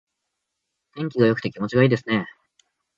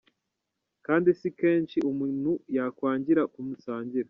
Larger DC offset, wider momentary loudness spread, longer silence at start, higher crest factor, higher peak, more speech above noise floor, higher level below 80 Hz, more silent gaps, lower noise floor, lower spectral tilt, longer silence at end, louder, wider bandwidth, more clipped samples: neither; about the same, 11 LU vs 10 LU; about the same, 0.95 s vs 0.9 s; about the same, 20 dB vs 18 dB; first, -4 dBFS vs -10 dBFS; about the same, 59 dB vs 57 dB; first, -60 dBFS vs -70 dBFS; neither; about the same, -80 dBFS vs -83 dBFS; about the same, -8 dB/octave vs -7 dB/octave; first, 0.7 s vs 0.05 s; first, -22 LUFS vs -27 LUFS; first, 7.4 kHz vs 5.6 kHz; neither